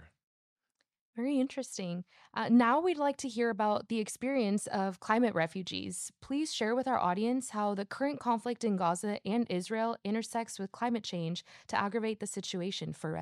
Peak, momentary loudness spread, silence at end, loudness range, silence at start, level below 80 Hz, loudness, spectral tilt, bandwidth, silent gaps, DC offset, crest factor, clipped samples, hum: -14 dBFS; 9 LU; 0 s; 4 LU; 0 s; -74 dBFS; -33 LUFS; -5 dB/octave; 13 kHz; 0.24-0.56 s, 1.01-1.13 s; under 0.1%; 20 dB; under 0.1%; none